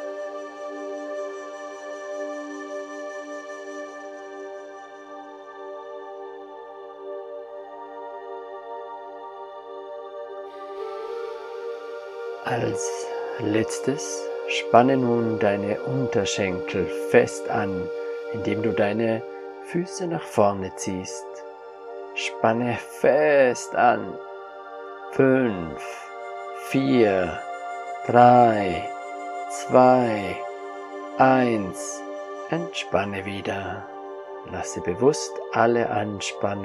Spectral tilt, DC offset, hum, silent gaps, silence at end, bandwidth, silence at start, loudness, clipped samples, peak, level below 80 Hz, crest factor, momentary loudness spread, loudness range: -5 dB/octave; under 0.1%; none; none; 0 s; 13.5 kHz; 0 s; -24 LUFS; under 0.1%; 0 dBFS; -66 dBFS; 24 dB; 19 LU; 16 LU